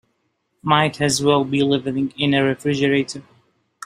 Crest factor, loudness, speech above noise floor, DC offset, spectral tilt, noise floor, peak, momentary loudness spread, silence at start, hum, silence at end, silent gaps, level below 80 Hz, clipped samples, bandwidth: 18 dB; -19 LUFS; 51 dB; under 0.1%; -5 dB/octave; -70 dBFS; -2 dBFS; 8 LU; 0.65 s; none; 0.65 s; none; -58 dBFS; under 0.1%; 15 kHz